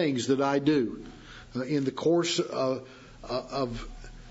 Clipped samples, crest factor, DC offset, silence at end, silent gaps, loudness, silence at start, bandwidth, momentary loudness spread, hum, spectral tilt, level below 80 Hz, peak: under 0.1%; 16 dB; under 0.1%; 0 s; none; -28 LUFS; 0 s; 8 kHz; 21 LU; none; -5 dB/octave; -50 dBFS; -12 dBFS